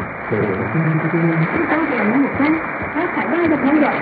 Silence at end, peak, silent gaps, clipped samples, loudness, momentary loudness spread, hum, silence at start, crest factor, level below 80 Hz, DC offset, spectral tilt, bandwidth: 0 s; -4 dBFS; none; under 0.1%; -18 LUFS; 5 LU; none; 0 s; 14 dB; -50 dBFS; under 0.1%; -13 dB/octave; 4.8 kHz